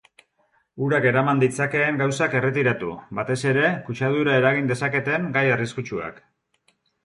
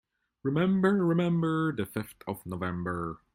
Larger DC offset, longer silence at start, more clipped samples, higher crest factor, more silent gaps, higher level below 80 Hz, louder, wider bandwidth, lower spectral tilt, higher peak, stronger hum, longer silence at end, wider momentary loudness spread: neither; first, 0.75 s vs 0.45 s; neither; about the same, 18 dB vs 16 dB; neither; about the same, -60 dBFS vs -60 dBFS; first, -22 LUFS vs -29 LUFS; second, 11.5 kHz vs 16.5 kHz; second, -6 dB/octave vs -8 dB/octave; first, -6 dBFS vs -12 dBFS; neither; first, 0.9 s vs 0.2 s; about the same, 10 LU vs 12 LU